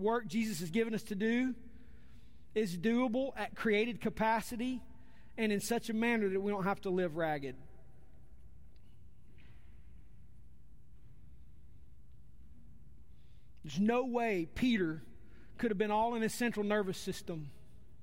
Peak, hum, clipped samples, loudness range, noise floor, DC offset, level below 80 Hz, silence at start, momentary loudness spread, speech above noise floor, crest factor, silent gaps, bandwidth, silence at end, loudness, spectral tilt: -18 dBFS; none; under 0.1%; 6 LU; -60 dBFS; 0.4%; -60 dBFS; 0 s; 11 LU; 26 dB; 18 dB; none; 16 kHz; 0.5 s; -35 LUFS; -5.5 dB/octave